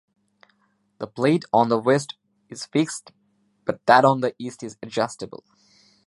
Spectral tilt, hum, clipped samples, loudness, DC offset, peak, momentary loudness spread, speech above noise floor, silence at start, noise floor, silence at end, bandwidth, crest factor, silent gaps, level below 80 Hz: -5.5 dB/octave; none; under 0.1%; -21 LUFS; under 0.1%; -2 dBFS; 20 LU; 45 dB; 1 s; -67 dBFS; 0.8 s; 11.5 kHz; 22 dB; none; -70 dBFS